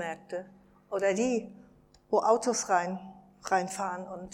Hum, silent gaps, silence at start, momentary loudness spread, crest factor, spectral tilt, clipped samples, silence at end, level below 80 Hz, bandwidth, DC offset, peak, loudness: none; none; 0 s; 15 LU; 20 dB; -4 dB/octave; under 0.1%; 0 s; -68 dBFS; 15.5 kHz; under 0.1%; -10 dBFS; -30 LUFS